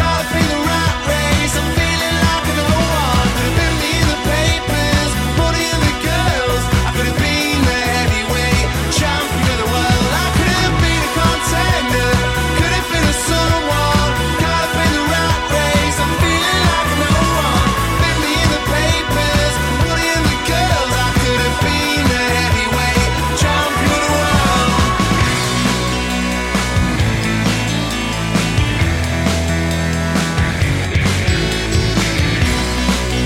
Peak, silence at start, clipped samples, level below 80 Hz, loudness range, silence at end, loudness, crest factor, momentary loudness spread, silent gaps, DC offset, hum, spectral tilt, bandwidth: -4 dBFS; 0 s; under 0.1%; -24 dBFS; 2 LU; 0 s; -15 LUFS; 12 dB; 3 LU; none; under 0.1%; none; -4.5 dB/octave; 16.5 kHz